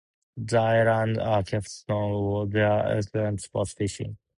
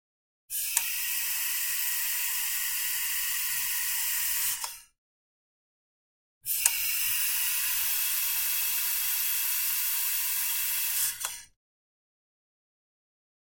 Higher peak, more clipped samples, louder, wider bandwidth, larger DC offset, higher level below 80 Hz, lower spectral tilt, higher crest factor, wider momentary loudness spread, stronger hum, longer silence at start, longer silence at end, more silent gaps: second, -10 dBFS vs -2 dBFS; neither; about the same, -26 LUFS vs -26 LUFS; second, 11 kHz vs 17 kHz; neither; first, -50 dBFS vs -64 dBFS; first, -6.5 dB/octave vs 4 dB/octave; second, 16 dB vs 30 dB; first, 9 LU vs 4 LU; neither; second, 0.35 s vs 0.5 s; second, 0.25 s vs 2.15 s; second, none vs 4.98-6.41 s